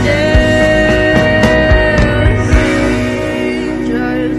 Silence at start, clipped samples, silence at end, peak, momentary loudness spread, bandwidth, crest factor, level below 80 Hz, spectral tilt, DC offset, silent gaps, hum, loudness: 0 s; under 0.1%; 0 s; 0 dBFS; 6 LU; 13 kHz; 10 dB; -18 dBFS; -6 dB/octave; under 0.1%; none; none; -11 LUFS